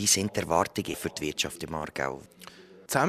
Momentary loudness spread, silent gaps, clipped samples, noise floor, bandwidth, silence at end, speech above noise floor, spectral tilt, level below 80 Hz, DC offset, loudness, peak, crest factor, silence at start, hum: 23 LU; none; under 0.1%; -50 dBFS; 14.5 kHz; 0 s; 20 dB; -2.5 dB/octave; -56 dBFS; under 0.1%; -29 LUFS; -6 dBFS; 22 dB; 0 s; none